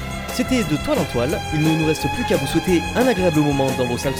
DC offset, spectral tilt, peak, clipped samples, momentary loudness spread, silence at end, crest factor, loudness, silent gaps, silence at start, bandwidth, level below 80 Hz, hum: 0.1%; -5.5 dB/octave; -4 dBFS; under 0.1%; 4 LU; 0 s; 14 dB; -19 LUFS; none; 0 s; 18 kHz; -36 dBFS; none